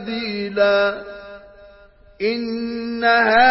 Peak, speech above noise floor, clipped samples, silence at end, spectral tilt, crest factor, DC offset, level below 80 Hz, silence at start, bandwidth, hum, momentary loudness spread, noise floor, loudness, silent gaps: -4 dBFS; 30 dB; under 0.1%; 0 s; -8 dB/octave; 16 dB; under 0.1%; -54 dBFS; 0 s; 5.8 kHz; none; 19 LU; -48 dBFS; -19 LUFS; none